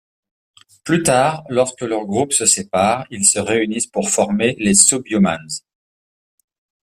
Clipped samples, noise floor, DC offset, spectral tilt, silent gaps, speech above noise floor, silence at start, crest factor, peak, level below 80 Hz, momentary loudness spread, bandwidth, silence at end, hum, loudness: under 0.1%; under -90 dBFS; under 0.1%; -3 dB/octave; none; over 73 dB; 0.85 s; 18 dB; 0 dBFS; -54 dBFS; 9 LU; 15.5 kHz; 1.4 s; none; -16 LUFS